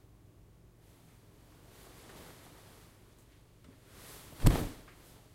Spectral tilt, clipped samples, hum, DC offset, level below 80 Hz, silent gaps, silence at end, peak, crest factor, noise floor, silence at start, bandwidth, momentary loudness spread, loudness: -6 dB/octave; under 0.1%; none; under 0.1%; -42 dBFS; none; 0.6 s; -8 dBFS; 30 dB; -60 dBFS; 4.4 s; 16 kHz; 30 LU; -33 LUFS